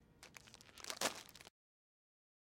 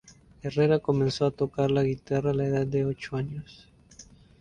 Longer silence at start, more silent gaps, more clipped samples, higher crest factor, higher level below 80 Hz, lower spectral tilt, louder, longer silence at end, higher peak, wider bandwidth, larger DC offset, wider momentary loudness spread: second, 0 s vs 0.45 s; neither; neither; first, 30 dB vs 16 dB; second, -78 dBFS vs -54 dBFS; second, -1 dB/octave vs -7.5 dB/octave; second, -44 LUFS vs -27 LUFS; first, 1.1 s vs 0.4 s; second, -20 dBFS vs -12 dBFS; first, 16.5 kHz vs 9.4 kHz; neither; first, 19 LU vs 9 LU